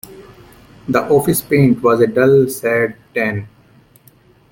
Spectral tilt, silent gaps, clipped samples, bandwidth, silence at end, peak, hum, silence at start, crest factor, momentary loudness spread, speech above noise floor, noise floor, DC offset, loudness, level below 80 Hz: -6.5 dB/octave; none; under 0.1%; 17 kHz; 1.05 s; -2 dBFS; none; 0.1 s; 14 dB; 9 LU; 35 dB; -49 dBFS; under 0.1%; -15 LUFS; -50 dBFS